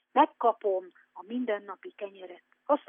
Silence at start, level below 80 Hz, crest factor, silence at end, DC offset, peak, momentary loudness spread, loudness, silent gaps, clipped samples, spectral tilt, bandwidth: 0.15 s; under -90 dBFS; 20 dB; 0.1 s; under 0.1%; -10 dBFS; 23 LU; -30 LUFS; none; under 0.1%; -2 dB/octave; 3.7 kHz